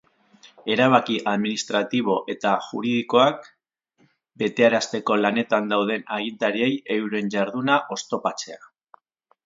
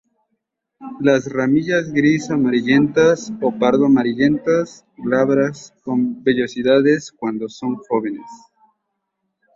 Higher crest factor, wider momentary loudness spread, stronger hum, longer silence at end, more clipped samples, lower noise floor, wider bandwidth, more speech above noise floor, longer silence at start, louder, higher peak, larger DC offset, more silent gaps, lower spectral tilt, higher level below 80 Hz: first, 22 dB vs 16 dB; about the same, 9 LU vs 11 LU; neither; second, 0.9 s vs 1.2 s; neither; second, -67 dBFS vs -75 dBFS; about the same, 7.8 kHz vs 7.6 kHz; second, 45 dB vs 58 dB; second, 0.65 s vs 0.8 s; second, -22 LUFS vs -18 LUFS; about the same, 0 dBFS vs -2 dBFS; neither; neither; second, -4.5 dB/octave vs -6 dB/octave; second, -72 dBFS vs -56 dBFS